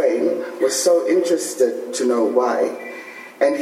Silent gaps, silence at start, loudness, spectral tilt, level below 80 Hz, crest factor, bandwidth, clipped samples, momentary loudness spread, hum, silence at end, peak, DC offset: none; 0 s; -19 LUFS; -2.5 dB/octave; -84 dBFS; 16 dB; 15 kHz; under 0.1%; 13 LU; none; 0 s; -4 dBFS; under 0.1%